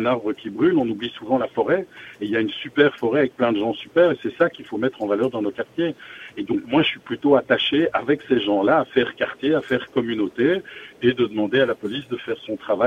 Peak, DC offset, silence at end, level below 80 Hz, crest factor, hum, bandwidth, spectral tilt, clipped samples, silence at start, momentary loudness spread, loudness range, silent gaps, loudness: -2 dBFS; under 0.1%; 0 s; -60 dBFS; 20 dB; none; 7.4 kHz; -7 dB/octave; under 0.1%; 0 s; 10 LU; 3 LU; none; -22 LUFS